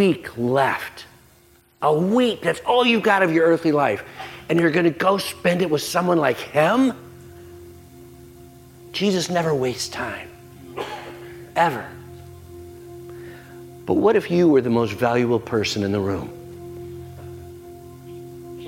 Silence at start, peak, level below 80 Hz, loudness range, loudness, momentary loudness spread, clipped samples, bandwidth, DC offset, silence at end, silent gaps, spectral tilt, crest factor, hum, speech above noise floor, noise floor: 0 s; -2 dBFS; -58 dBFS; 9 LU; -20 LUFS; 23 LU; under 0.1%; 16.5 kHz; under 0.1%; 0 s; none; -5.5 dB/octave; 20 dB; none; 35 dB; -54 dBFS